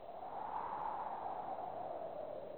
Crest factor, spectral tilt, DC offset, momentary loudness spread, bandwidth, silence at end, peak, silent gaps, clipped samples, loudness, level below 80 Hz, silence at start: 14 dB; -7.5 dB/octave; 0.1%; 4 LU; over 20 kHz; 0 s; -32 dBFS; none; under 0.1%; -44 LUFS; -76 dBFS; 0 s